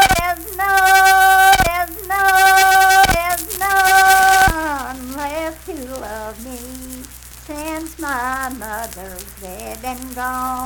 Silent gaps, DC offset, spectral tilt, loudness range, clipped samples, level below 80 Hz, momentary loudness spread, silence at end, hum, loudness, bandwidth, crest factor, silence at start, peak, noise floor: none; under 0.1%; -2 dB/octave; 15 LU; under 0.1%; -34 dBFS; 21 LU; 0 s; none; -13 LUFS; 19.5 kHz; 16 dB; 0 s; 0 dBFS; -36 dBFS